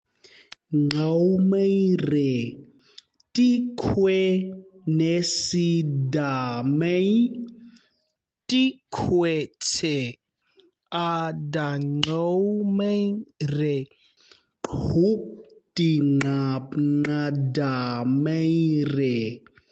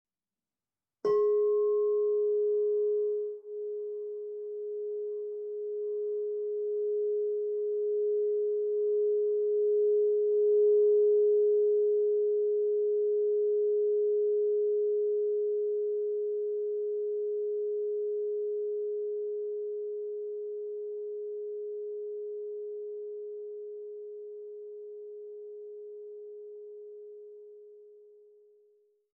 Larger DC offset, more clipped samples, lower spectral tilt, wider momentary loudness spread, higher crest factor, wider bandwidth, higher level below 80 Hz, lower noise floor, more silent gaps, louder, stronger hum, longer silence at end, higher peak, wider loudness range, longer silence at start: neither; neither; about the same, -6 dB/octave vs -7 dB/octave; second, 9 LU vs 18 LU; first, 20 dB vs 12 dB; first, 8.8 kHz vs 2.1 kHz; first, -56 dBFS vs under -90 dBFS; second, -78 dBFS vs under -90 dBFS; neither; first, -24 LUFS vs -30 LUFS; neither; second, 0.35 s vs 1.15 s; first, -4 dBFS vs -20 dBFS; second, 3 LU vs 18 LU; second, 0.7 s vs 1.05 s